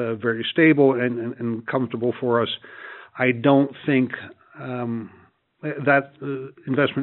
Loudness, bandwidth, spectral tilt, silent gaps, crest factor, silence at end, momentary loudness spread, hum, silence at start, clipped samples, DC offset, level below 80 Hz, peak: -22 LUFS; 4.2 kHz; -4.5 dB/octave; none; 20 dB; 0 s; 17 LU; none; 0 s; under 0.1%; under 0.1%; -70 dBFS; -2 dBFS